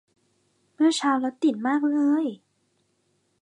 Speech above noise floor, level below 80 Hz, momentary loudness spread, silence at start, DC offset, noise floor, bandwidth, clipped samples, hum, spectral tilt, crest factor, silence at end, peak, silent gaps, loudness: 47 dB; -84 dBFS; 3 LU; 0.8 s; under 0.1%; -70 dBFS; 10.5 kHz; under 0.1%; none; -3.5 dB/octave; 16 dB; 1.05 s; -10 dBFS; none; -24 LUFS